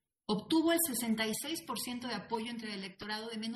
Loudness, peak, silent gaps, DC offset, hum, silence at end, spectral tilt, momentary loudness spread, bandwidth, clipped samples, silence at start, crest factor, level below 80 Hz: -35 LUFS; -20 dBFS; none; under 0.1%; none; 0 s; -3 dB/octave; 10 LU; 13 kHz; under 0.1%; 0.3 s; 16 dB; -72 dBFS